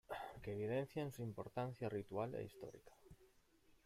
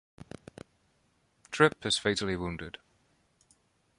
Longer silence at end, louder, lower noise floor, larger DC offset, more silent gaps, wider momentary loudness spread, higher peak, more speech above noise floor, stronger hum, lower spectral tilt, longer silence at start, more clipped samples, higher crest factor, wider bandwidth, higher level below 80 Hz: second, 0.15 s vs 1.3 s; second, -47 LUFS vs -29 LUFS; about the same, -73 dBFS vs -71 dBFS; neither; neither; second, 15 LU vs 24 LU; second, -30 dBFS vs -8 dBFS; second, 27 dB vs 42 dB; neither; first, -7 dB/octave vs -4 dB/octave; about the same, 0.1 s vs 0.2 s; neither; second, 18 dB vs 26 dB; first, 16 kHz vs 11.5 kHz; second, -72 dBFS vs -58 dBFS